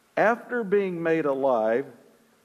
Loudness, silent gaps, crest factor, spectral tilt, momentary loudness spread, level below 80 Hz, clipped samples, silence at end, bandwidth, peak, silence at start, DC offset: -25 LUFS; none; 16 dB; -7.5 dB/octave; 5 LU; -80 dBFS; under 0.1%; 0.5 s; 13 kHz; -8 dBFS; 0.15 s; under 0.1%